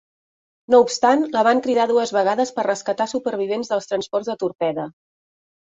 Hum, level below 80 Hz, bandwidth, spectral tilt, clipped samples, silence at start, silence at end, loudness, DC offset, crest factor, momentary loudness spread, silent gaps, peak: none; -68 dBFS; 8 kHz; -4 dB/octave; under 0.1%; 0.7 s; 0.85 s; -20 LUFS; under 0.1%; 18 dB; 8 LU; none; -2 dBFS